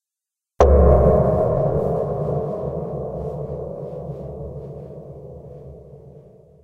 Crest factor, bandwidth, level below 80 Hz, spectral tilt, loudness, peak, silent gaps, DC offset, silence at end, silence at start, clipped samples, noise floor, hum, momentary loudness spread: 20 dB; 7 kHz; -26 dBFS; -9.5 dB/octave; -20 LUFS; -2 dBFS; none; under 0.1%; 0.4 s; 0.6 s; under 0.1%; -87 dBFS; none; 24 LU